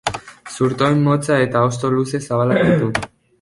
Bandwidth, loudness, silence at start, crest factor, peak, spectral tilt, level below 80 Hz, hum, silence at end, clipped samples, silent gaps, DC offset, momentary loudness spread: 11.5 kHz; -17 LUFS; 0.05 s; 16 dB; 0 dBFS; -6.5 dB/octave; -48 dBFS; none; 0.35 s; under 0.1%; none; under 0.1%; 10 LU